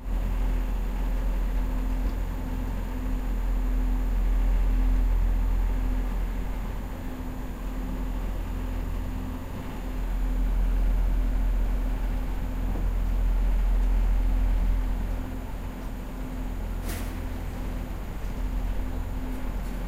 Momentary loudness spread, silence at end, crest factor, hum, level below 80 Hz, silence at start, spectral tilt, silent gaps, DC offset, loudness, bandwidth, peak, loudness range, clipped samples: 9 LU; 0 s; 12 dB; none; -26 dBFS; 0 s; -7 dB/octave; none; under 0.1%; -31 LUFS; 15 kHz; -14 dBFS; 6 LU; under 0.1%